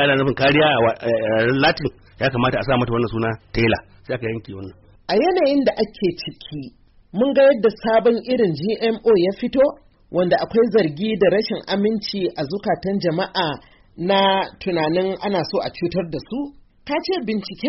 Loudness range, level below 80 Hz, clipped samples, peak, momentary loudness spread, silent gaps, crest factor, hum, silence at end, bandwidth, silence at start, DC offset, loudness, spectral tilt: 4 LU; -46 dBFS; under 0.1%; -6 dBFS; 13 LU; none; 14 dB; none; 0 s; 6 kHz; 0 s; under 0.1%; -20 LUFS; -4 dB/octave